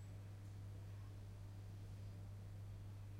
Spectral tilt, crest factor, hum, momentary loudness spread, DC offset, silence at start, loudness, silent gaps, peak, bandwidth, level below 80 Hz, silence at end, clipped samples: -7 dB/octave; 8 dB; none; 1 LU; under 0.1%; 0 s; -55 LUFS; none; -44 dBFS; 15.5 kHz; -62 dBFS; 0 s; under 0.1%